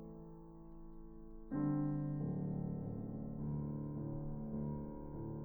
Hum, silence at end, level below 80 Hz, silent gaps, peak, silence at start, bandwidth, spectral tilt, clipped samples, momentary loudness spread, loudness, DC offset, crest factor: none; 0 s; -54 dBFS; none; -26 dBFS; 0 s; 2.2 kHz; -13 dB/octave; under 0.1%; 18 LU; -42 LUFS; under 0.1%; 16 dB